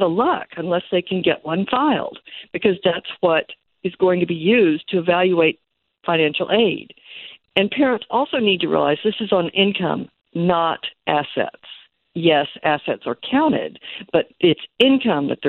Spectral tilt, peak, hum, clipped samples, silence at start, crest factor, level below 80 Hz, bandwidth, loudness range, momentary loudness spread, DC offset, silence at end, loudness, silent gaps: -8 dB/octave; -2 dBFS; none; under 0.1%; 0 s; 18 dB; -60 dBFS; 4.4 kHz; 3 LU; 13 LU; under 0.1%; 0 s; -19 LUFS; none